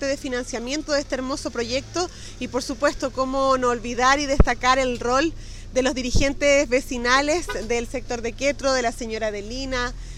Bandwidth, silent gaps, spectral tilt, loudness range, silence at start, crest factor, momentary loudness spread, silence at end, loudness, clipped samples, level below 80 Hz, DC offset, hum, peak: 14 kHz; none; -4 dB/octave; 4 LU; 0 s; 22 dB; 9 LU; 0 s; -23 LUFS; under 0.1%; -32 dBFS; under 0.1%; none; 0 dBFS